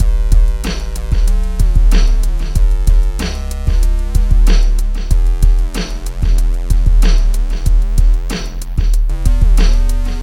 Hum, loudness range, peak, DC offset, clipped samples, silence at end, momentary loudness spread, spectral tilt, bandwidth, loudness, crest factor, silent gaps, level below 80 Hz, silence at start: none; 1 LU; 0 dBFS; under 0.1%; 0.1%; 0 s; 7 LU; -5.5 dB/octave; 12.5 kHz; -17 LUFS; 10 dB; none; -10 dBFS; 0 s